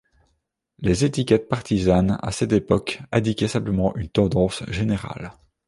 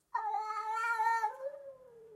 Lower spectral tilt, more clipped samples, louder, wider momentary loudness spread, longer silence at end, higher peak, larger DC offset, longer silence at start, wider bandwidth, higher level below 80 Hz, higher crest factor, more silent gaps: first, -6.5 dB/octave vs 0 dB/octave; neither; first, -22 LUFS vs -35 LUFS; second, 7 LU vs 16 LU; first, 0.35 s vs 0 s; first, -4 dBFS vs -20 dBFS; neither; first, 0.8 s vs 0.15 s; second, 11.5 kHz vs 15.5 kHz; first, -40 dBFS vs -88 dBFS; about the same, 20 dB vs 16 dB; neither